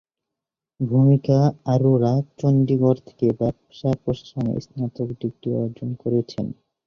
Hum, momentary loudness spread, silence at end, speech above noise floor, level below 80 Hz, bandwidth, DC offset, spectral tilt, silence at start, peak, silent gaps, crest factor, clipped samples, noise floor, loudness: none; 11 LU; 0.35 s; 66 dB; -54 dBFS; 6.6 kHz; under 0.1%; -10 dB/octave; 0.8 s; -4 dBFS; none; 16 dB; under 0.1%; -86 dBFS; -22 LUFS